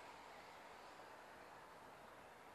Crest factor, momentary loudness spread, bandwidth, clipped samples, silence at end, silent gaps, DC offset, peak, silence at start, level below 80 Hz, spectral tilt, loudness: 14 dB; 2 LU; 13 kHz; under 0.1%; 0 s; none; under 0.1%; -46 dBFS; 0 s; -84 dBFS; -3 dB/octave; -59 LUFS